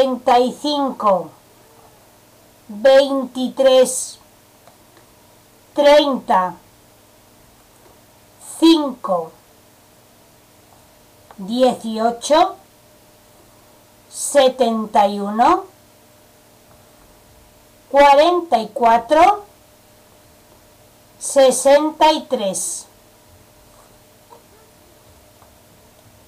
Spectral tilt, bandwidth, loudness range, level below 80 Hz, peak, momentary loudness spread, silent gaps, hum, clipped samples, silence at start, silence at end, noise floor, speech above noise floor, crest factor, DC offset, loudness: -3 dB/octave; 15.5 kHz; 6 LU; -54 dBFS; -4 dBFS; 13 LU; none; none; under 0.1%; 0 s; 3.45 s; -50 dBFS; 35 dB; 14 dB; under 0.1%; -16 LUFS